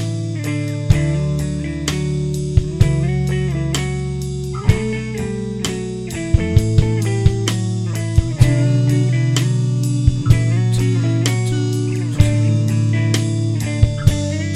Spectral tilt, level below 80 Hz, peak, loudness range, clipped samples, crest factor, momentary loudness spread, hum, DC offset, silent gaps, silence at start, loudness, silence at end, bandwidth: -6.5 dB/octave; -28 dBFS; 0 dBFS; 3 LU; under 0.1%; 16 dB; 7 LU; none; under 0.1%; none; 0 s; -18 LUFS; 0 s; 13.5 kHz